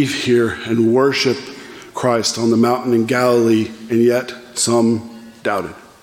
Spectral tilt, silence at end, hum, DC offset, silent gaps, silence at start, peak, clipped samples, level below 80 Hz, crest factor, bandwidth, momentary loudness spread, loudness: -4.5 dB/octave; 0.2 s; none; under 0.1%; none; 0 s; -2 dBFS; under 0.1%; -58 dBFS; 14 dB; 16.5 kHz; 12 LU; -16 LUFS